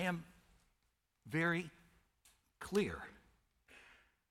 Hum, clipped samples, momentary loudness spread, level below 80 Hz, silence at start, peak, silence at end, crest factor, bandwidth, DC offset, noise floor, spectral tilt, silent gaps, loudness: none; under 0.1%; 25 LU; -70 dBFS; 0 s; -24 dBFS; 0.5 s; 20 dB; 16 kHz; under 0.1%; -82 dBFS; -5.5 dB/octave; none; -39 LUFS